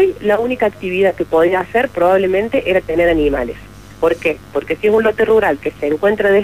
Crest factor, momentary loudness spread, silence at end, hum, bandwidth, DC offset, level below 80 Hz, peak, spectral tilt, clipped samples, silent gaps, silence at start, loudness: 12 dB; 7 LU; 0 s; 50 Hz at -40 dBFS; 15.5 kHz; 0.4%; -38 dBFS; -4 dBFS; -6.5 dB/octave; under 0.1%; none; 0 s; -15 LUFS